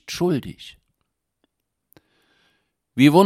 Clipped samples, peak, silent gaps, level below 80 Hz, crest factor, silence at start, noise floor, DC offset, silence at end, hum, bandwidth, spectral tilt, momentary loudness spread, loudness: under 0.1%; -2 dBFS; none; -58 dBFS; 22 dB; 0.1 s; -76 dBFS; under 0.1%; 0 s; none; 15.5 kHz; -6 dB/octave; 25 LU; -21 LUFS